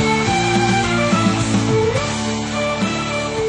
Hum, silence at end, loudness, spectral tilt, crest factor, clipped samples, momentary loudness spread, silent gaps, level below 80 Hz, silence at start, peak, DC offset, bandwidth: none; 0 s; -17 LUFS; -4.5 dB/octave; 14 dB; under 0.1%; 5 LU; none; -38 dBFS; 0 s; -4 dBFS; under 0.1%; 10.5 kHz